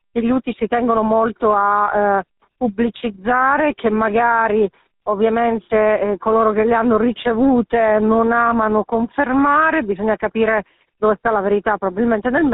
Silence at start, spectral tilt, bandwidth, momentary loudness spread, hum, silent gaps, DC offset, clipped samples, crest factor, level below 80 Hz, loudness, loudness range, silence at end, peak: 0.15 s; -4.5 dB/octave; 4 kHz; 6 LU; none; none; under 0.1%; under 0.1%; 14 dB; -46 dBFS; -17 LUFS; 2 LU; 0 s; -2 dBFS